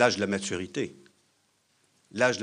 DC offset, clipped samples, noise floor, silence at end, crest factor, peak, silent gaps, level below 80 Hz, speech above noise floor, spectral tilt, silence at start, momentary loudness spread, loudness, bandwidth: under 0.1%; under 0.1%; -70 dBFS; 0 s; 24 dB; -6 dBFS; none; -70 dBFS; 43 dB; -4 dB/octave; 0 s; 11 LU; -30 LUFS; 10.5 kHz